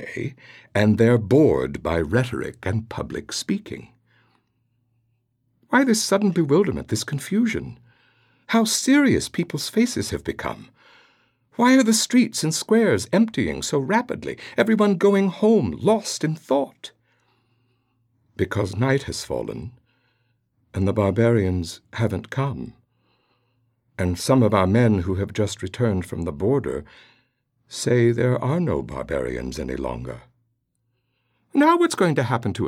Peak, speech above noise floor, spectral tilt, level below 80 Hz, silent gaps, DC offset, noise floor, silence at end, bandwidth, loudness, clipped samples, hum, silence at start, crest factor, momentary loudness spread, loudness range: -4 dBFS; 51 dB; -5.5 dB/octave; -48 dBFS; none; under 0.1%; -72 dBFS; 0 s; 16 kHz; -21 LUFS; under 0.1%; none; 0 s; 18 dB; 14 LU; 7 LU